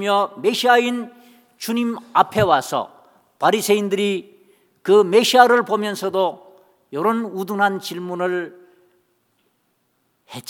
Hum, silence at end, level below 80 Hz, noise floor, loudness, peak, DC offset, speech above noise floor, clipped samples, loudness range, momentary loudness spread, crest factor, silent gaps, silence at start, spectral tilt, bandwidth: none; 0.1 s; -62 dBFS; -67 dBFS; -19 LUFS; 0 dBFS; under 0.1%; 49 dB; under 0.1%; 7 LU; 14 LU; 20 dB; none; 0 s; -4 dB/octave; 19 kHz